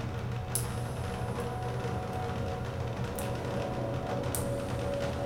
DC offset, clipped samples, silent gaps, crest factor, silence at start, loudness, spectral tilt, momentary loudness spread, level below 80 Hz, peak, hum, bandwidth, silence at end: under 0.1%; under 0.1%; none; 24 dB; 0 s; -34 LUFS; -5.5 dB/octave; 3 LU; -46 dBFS; -10 dBFS; none; 18 kHz; 0 s